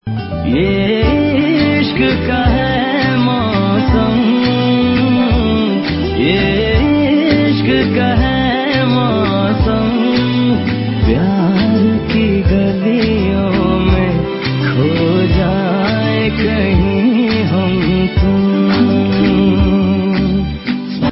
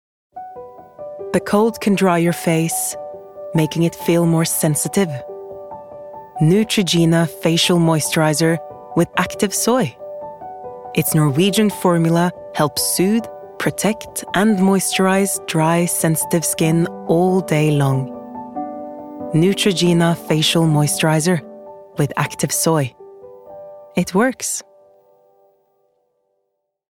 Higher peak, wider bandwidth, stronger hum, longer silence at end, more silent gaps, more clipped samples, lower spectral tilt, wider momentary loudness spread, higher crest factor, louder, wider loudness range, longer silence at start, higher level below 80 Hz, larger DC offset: about the same, 0 dBFS vs -2 dBFS; second, 5.8 kHz vs 17 kHz; neither; second, 0 s vs 2.35 s; neither; neither; first, -11.5 dB/octave vs -5 dB/octave; second, 3 LU vs 18 LU; about the same, 12 dB vs 16 dB; first, -13 LUFS vs -17 LUFS; second, 1 LU vs 4 LU; second, 0.05 s vs 0.35 s; first, -24 dBFS vs -58 dBFS; neither